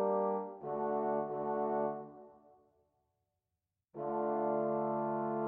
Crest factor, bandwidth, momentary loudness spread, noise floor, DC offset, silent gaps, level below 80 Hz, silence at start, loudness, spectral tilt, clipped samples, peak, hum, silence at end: 14 dB; 3.2 kHz; 11 LU; -89 dBFS; under 0.1%; none; -80 dBFS; 0 s; -36 LUFS; -11.5 dB/octave; under 0.1%; -22 dBFS; none; 0 s